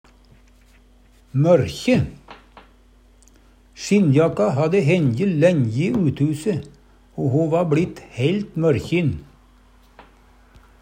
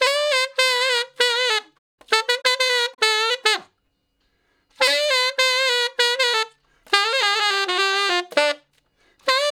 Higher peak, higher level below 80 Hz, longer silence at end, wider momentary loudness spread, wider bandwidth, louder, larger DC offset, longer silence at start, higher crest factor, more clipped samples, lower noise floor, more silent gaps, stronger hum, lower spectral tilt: about the same, -2 dBFS vs 0 dBFS; first, -50 dBFS vs -74 dBFS; first, 1.6 s vs 0.05 s; first, 10 LU vs 4 LU; second, 10.5 kHz vs 18.5 kHz; about the same, -20 LUFS vs -19 LUFS; neither; first, 1.35 s vs 0 s; about the same, 18 dB vs 22 dB; neither; second, -52 dBFS vs -70 dBFS; second, none vs 1.78-1.98 s; neither; first, -7.5 dB/octave vs 2 dB/octave